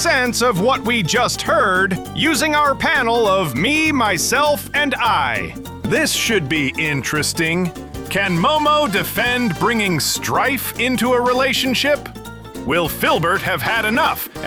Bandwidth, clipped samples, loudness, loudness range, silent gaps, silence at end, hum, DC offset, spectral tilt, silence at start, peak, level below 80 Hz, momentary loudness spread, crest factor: 19.5 kHz; under 0.1%; -17 LUFS; 2 LU; none; 0 s; none; 0.1%; -3.5 dB/octave; 0 s; -4 dBFS; -42 dBFS; 5 LU; 12 dB